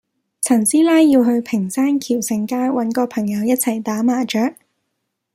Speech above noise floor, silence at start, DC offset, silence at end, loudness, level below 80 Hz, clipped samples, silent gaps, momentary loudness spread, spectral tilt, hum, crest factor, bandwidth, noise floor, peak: 58 dB; 0.4 s; under 0.1%; 0.85 s; -17 LUFS; -64 dBFS; under 0.1%; none; 8 LU; -4.5 dB/octave; none; 14 dB; 16 kHz; -74 dBFS; -2 dBFS